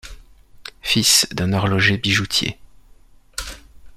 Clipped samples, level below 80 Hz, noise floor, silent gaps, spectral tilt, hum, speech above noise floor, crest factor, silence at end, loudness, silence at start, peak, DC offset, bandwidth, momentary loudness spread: under 0.1%; -42 dBFS; -48 dBFS; none; -2.5 dB/octave; none; 30 dB; 20 dB; 0 s; -17 LUFS; 0.05 s; 0 dBFS; under 0.1%; 16 kHz; 20 LU